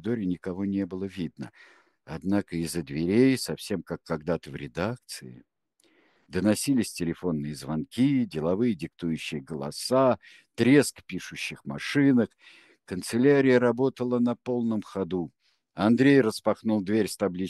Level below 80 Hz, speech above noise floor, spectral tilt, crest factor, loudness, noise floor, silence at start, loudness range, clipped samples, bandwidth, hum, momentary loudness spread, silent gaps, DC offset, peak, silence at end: -60 dBFS; 40 dB; -6 dB/octave; 20 dB; -26 LUFS; -66 dBFS; 0.05 s; 6 LU; under 0.1%; 12.5 kHz; none; 14 LU; none; under 0.1%; -6 dBFS; 0 s